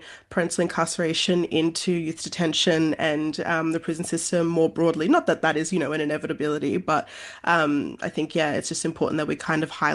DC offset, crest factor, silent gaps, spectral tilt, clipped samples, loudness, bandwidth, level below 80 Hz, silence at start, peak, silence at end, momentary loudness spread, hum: under 0.1%; 18 dB; none; -4.5 dB/octave; under 0.1%; -24 LUFS; 12.5 kHz; -62 dBFS; 0 s; -6 dBFS; 0 s; 6 LU; none